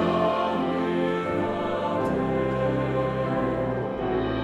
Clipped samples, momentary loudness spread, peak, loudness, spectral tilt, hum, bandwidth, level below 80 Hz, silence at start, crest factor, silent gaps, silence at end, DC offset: under 0.1%; 3 LU; -12 dBFS; -26 LUFS; -8 dB/octave; none; 11.5 kHz; -46 dBFS; 0 s; 14 dB; none; 0 s; under 0.1%